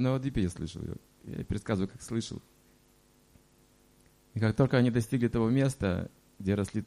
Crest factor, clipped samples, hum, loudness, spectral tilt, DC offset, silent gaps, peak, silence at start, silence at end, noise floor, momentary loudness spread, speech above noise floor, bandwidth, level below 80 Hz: 20 dB; under 0.1%; none; -31 LUFS; -7 dB/octave; under 0.1%; none; -10 dBFS; 0 s; 0 s; -64 dBFS; 16 LU; 34 dB; 14.5 kHz; -50 dBFS